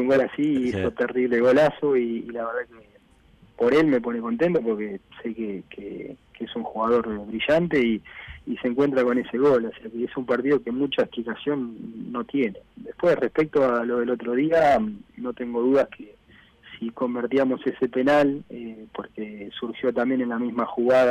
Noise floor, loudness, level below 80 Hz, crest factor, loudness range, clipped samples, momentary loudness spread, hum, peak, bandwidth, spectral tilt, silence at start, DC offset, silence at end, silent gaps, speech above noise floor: -56 dBFS; -24 LUFS; -56 dBFS; 12 dB; 3 LU; under 0.1%; 16 LU; none; -12 dBFS; 10 kHz; -7 dB/octave; 0 s; under 0.1%; 0 s; none; 33 dB